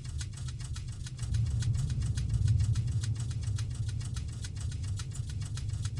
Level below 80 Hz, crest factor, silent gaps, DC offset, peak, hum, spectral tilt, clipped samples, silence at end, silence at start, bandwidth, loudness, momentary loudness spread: -40 dBFS; 14 dB; none; under 0.1%; -18 dBFS; none; -5.5 dB/octave; under 0.1%; 0 s; 0 s; 11.5 kHz; -34 LUFS; 10 LU